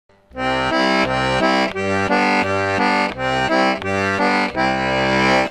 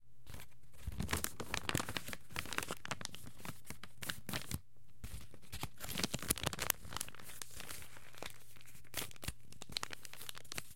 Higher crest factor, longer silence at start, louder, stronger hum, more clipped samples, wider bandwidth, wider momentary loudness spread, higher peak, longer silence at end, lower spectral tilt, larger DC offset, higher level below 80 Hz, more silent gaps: second, 16 dB vs 38 dB; first, 0.35 s vs 0 s; first, -17 LUFS vs -43 LUFS; neither; neither; second, 12.5 kHz vs 17 kHz; second, 4 LU vs 17 LU; first, -2 dBFS vs -8 dBFS; about the same, 0 s vs 0 s; first, -5 dB/octave vs -2.5 dB/octave; second, under 0.1% vs 0.6%; first, -42 dBFS vs -58 dBFS; neither